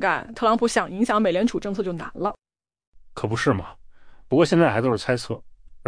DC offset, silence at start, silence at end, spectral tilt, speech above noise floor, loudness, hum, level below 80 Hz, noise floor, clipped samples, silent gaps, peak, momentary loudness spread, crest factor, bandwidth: under 0.1%; 0 s; 0.05 s; -6 dB/octave; 22 dB; -23 LUFS; none; -50 dBFS; -44 dBFS; under 0.1%; 2.87-2.92 s; -6 dBFS; 12 LU; 18 dB; 10.5 kHz